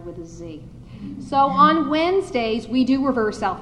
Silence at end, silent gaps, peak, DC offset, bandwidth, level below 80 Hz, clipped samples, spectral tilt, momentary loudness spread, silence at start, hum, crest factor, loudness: 0 s; none; -4 dBFS; under 0.1%; 10.5 kHz; -46 dBFS; under 0.1%; -6 dB/octave; 21 LU; 0 s; none; 18 dB; -19 LUFS